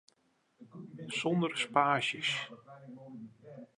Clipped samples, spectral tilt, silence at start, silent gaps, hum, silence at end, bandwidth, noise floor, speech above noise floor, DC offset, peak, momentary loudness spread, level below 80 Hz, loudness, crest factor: under 0.1%; -4.5 dB/octave; 0.6 s; none; none; 0.1 s; 11 kHz; -74 dBFS; 40 dB; under 0.1%; -12 dBFS; 23 LU; -84 dBFS; -32 LUFS; 24 dB